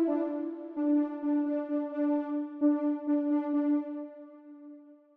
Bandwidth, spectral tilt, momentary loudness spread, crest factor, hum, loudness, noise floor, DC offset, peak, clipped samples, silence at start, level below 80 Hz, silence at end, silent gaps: 3.4 kHz; -8.5 dB/octave; 21 LU; 14 dB; none; -30 LUFS; -52 dBFS; under 0.1%; -16 dBFS; under 0.1%; 0 s; -86 dBFS; 0.2 s; none